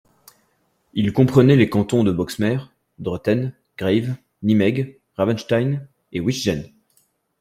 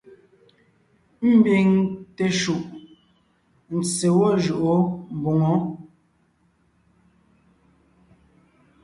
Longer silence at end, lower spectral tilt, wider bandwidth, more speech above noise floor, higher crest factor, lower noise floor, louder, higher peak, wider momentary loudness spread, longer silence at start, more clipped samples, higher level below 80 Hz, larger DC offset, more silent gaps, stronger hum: second, 0.75 s vs 3 s; about the same, -7 dB/octave vs -6 dB/octave; first, 15 kHz vs 11.5 kHz; about the same, 47 dB vs 45 dB; about the same, 18 dB vs 18 dB; about the same, -66 dBFS vs -64 dBFS; about the same, -20 LUFS vs -21 LUFS; first, -2 dBFS vs -6 dBFS; about the same, 15 LU vs 13 LU; second, 0.95 s vs 1.2 s; neither; first, -52 dBFS vs -60 dBFS; neither; neither; neither